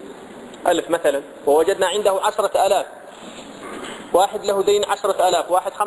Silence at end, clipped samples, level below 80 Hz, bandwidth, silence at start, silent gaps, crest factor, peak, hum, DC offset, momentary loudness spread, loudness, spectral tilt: 0 s; under 0.1%; -58 dBFS; 11 kHz; 0 s; none; 18 dB; -2 dBFS; none; under 0.1%; 19 LU; -19 LUFS; -2.5 dB/octave